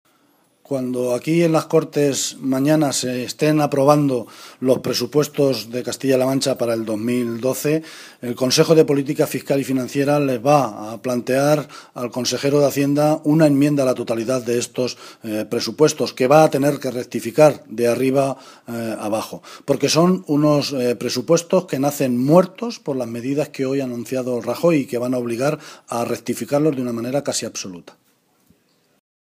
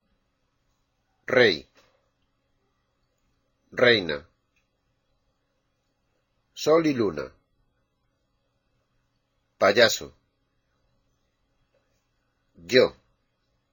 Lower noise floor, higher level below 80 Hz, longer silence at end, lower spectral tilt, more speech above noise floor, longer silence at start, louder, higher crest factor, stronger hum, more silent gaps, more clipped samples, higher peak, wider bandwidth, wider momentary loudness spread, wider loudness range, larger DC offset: second, -59 dBFS vs -74 dBFS; about the same, -68 dBFS vs -64 dBFS; first, 1.55 s vs 0.8 s; first, -5.5 dB/octave vs -3.5 dB/octave; second, 41 dB vs 52 dB; second, 0.7 s vs 1.3 s; first, -19 LUFS vs -22 LUFS; second, 18 dB vs 26 dB; neither; neither; neither; about the same, 0 dBFS vs -2 dBFS; about the same, 15.5 kHz vs 16.5 kHz; second, 11 LU vs 16 LU; about the same, 4 LU vs 3 LU; neither